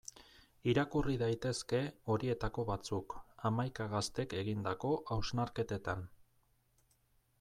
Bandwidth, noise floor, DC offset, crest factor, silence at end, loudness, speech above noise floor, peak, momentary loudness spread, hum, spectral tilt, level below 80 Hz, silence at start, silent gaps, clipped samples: 14 kHz; -74 dBFS; under 0.1%; 18 dB; 1.25 s; -38 LUFS; 37 dB; -20 dBFS; 7 LU; none; -6 dB/octave; -56 dBFS; 0.15 s; none; under 0.1%